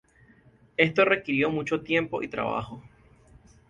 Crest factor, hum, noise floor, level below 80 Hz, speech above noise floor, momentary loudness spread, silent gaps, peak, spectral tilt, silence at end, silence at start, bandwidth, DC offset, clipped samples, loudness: 22 dB; none; -58 dBFS; -60 dBFS; 32 dB; 13 LU; none; -6 dBFS; -6.5 dB/octave; 0.85 s; 0.8 s; 9.6 kHz; under 0.1%; under 0.1%; -26 LUFS